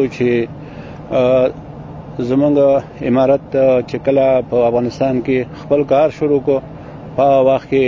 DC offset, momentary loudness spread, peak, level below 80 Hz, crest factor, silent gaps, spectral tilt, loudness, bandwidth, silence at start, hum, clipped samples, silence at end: under 0.1%; 18 LU; -2 dBFS; -44 dBFS; 14 dB; none; -8 dB/octave; -15 LUFS; 7.2 kHz; 0 s; none; under 0.1%; 0 s